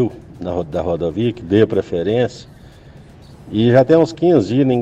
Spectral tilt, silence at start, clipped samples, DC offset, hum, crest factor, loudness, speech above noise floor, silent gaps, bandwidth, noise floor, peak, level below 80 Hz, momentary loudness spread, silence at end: -8 dB/octave; 0 s; under 0.1%; under 0.1%; none; 14 dB; -16 LUFS; 26 dB; none; 8.4 kHz; -41 dBFS; -2 dBFS; -44 dBFS; 11 LU; 0 s